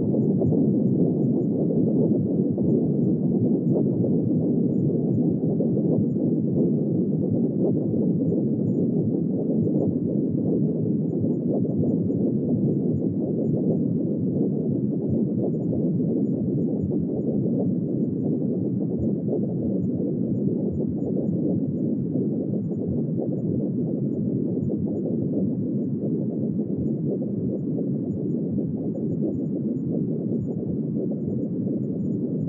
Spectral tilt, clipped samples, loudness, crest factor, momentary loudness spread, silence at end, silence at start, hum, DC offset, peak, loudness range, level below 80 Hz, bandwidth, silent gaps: -15.5 dB/octave; under 0.1%; -24 LUFS; 14 dB; 5 LU; 0 s; 0 s; none; under 0.1%; -10 dBFS; 4 LU; -60 dBFS; 1.5 kHz; none